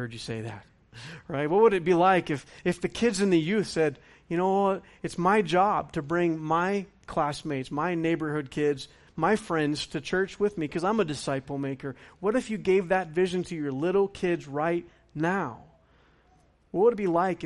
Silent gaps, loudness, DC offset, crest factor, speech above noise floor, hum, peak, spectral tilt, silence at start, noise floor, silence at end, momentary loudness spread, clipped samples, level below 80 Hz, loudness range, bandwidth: none; -27 LUFS; under 0.1%; 18 dB; 35 dB; none; -10 dBFS; -6 dB/octave; 0 s; -62 dBFS; 0 s; 12 LU; under 0.1%; -58 dBFS; 4 LU; 11.5 kHz